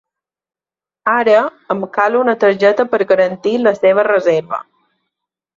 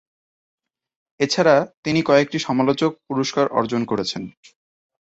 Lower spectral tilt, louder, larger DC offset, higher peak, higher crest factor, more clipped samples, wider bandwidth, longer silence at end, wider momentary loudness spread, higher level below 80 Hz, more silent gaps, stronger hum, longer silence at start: about the same, -6 dB/octave vs -5 dB/octave; first, -14 LUFS vs -20 LUFS; neither; about the same, -2 dBFS vs -2 dBFS; second, 14 dB vs 20 dB; neither; second, 7.4 kHz vs 8.2 kHz; first, 0.95 s vs 0.75 s; about the same, 9 LU vs 8 LU; about the same, -64 dBFS vs -60 dBFS; second, none vs 1.77-1.83 s; neither; second, 1.05 s vs 1.2 s